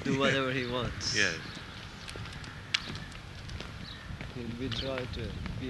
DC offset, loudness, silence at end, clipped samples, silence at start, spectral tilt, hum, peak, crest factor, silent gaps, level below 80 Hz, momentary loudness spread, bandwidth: under 0.1%; -34 LUFS; 0 s; under 0.1%; 0 s; -4 dB/octave; none; -6 dBFS; 28 dB; none; -48 dBFS; 15 LU; 12 kHz